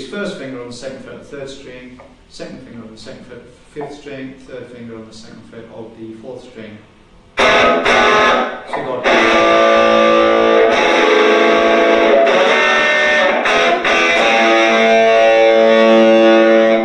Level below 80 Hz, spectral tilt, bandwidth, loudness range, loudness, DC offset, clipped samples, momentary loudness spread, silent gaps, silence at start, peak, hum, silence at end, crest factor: -46 dBFS; -3.5 dB/octave; 10.5 kHz; 22 LU; -11 LUFS; under 0.1%; under 0.1%; 22 LU; none; 0 s; 0 dBFS; none; 0 s; 14 dB